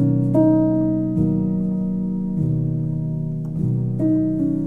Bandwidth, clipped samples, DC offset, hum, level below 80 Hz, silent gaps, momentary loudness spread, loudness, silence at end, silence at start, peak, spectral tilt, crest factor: 2 kHz; under 0.1%; under 0.1%; none; -40 dBFS; none; 8 LU; -20 LUFS; 0 s; 0 s; -6 dBFS; -12.5 dB/octave; 12 dB